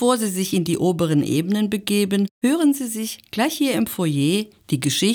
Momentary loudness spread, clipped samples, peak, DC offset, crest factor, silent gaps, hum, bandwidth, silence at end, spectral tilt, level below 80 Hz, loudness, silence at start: 5 LU; under 0.1%; -4 dBFS; under 0.1%; 16 dB; 2.31-2.41 s; none; over 20 kHz; 0 s; -5 dB/octave; -62 dBFS; -21 LUFS; 0 s